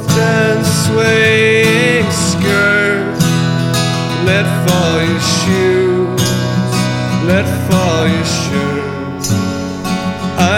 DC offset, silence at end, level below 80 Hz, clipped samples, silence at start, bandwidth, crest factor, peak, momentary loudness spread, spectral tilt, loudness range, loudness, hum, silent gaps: under 0.1%; 0 s; -40 dBFS; under 0.1%; 0 s; 17 kHz; 12 dB; 0 dBFS; 8 LU; -5 dB/octave; 4 LU; -13 LUFS; none; none